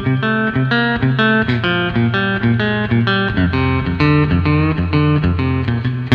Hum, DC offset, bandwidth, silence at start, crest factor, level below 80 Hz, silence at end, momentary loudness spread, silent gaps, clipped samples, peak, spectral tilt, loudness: none; under 0.1%; 5.8 kHz; 0 s; 14 dB; -32 dBFS; 0 s; 3 LU; none; under 0.1%; 0 dBFS; -8.5 dB/octave; -15 LUFS